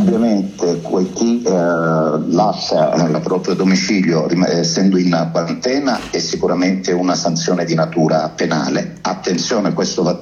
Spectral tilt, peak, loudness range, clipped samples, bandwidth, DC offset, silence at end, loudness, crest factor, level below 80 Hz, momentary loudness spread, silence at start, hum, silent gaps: -5.5 dB/octave; 0 dBFS; 2 LU; under 0.1%; 7.6 kHz; under 0.1%; 0 s; -16 LUFS; 14 dB; -52 dBFS; 5 LU; 0 s; none; none